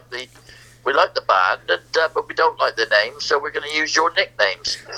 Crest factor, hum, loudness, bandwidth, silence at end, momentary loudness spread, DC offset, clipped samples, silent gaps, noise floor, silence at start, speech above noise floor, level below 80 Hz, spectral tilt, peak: 20 dB; none; -19 LUFS; 14.5 kHz; 0 s; 7 LU; under 0.1%; under 0.1%; none; -46 dBFS; 0.1 s; 26 dB; -58 dBFS; -1 dB/octave; 0 dBFS